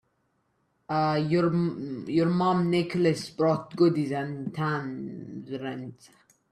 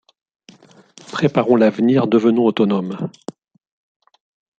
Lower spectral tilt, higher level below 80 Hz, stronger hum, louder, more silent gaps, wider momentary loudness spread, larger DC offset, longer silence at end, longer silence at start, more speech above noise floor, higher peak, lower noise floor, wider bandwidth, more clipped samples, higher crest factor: about the same, -7.5 dB/octave vs -7.5 dB/octave; about the same, -66 dBFS vs -64 dBFS; neither; second, -27 LUFS vs -17 LUFS; neither; about the same, 13 LU vs 15 LU; neither; second, 0.6 s vs 1.5 s; second, 0.9 s vs 1.1 s; first, 46 dB vs 32 dB; second, -10 dBFS vs -2 dBFS; first, -73 dBFS vs -47 dBFS; first, 11 kHz vs 8 kHz; neither; about the same, 16 dB vs 18 dB